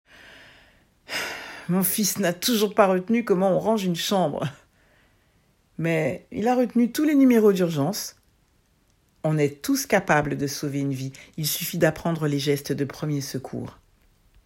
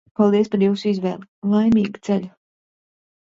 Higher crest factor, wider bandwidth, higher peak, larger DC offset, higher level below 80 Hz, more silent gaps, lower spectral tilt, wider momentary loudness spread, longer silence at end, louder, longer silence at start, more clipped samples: about the same, 20 dB vs 16 dB; first, 16.5 kHz vs 7.6 kHz; about the same, -6 dBFS vs -4 dBFS; neither; about the same, -58 dBFS vs -56 dBFS; second, none vs 1.28-1.42 s; second, -5 dB/octave vs -8 dB/octave; about the same, 12 LU vs 10 LU; second, 0.75 s vs 1 s; second, -23 LUFS vs -20 LUFS; first, 1.1 s vs 0.2 s; neither